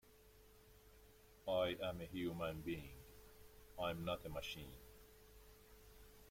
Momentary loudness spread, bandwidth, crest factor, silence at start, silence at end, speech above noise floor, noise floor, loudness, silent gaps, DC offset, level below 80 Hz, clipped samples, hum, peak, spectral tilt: 24 LU; 16.5 kHz; 20 dB; 0.05 s; 0 s; 22 dB; -66 dBFS; -45 LUFS; none; under 0.1%; -64 dBFS; under 0.1%; none; -28 dBFS; -5.5 dB/octave